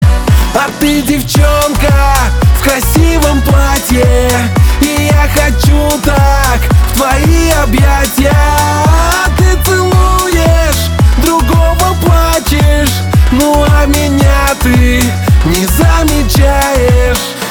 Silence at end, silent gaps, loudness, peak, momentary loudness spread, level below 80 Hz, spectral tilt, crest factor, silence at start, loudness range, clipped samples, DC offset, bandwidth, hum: 0 s; none; -9 LUFS; 0 dBFS; 2 LU; -12 dBFS; -5 dB/octave; 8 dB; 0 s; 0 LU; under 0.1%; 0.2%; over 20 kHz; none